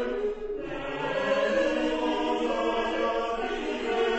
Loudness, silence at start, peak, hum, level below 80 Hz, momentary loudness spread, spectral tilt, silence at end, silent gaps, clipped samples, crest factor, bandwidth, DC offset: -28 LUFS; 0 s; -14 dBFS; none; -48 dBFS; 7 LU; -4.5 dB/octave; 0 s; none; under 0.1%; 14 dB; 8.4 kHz; under 0.1%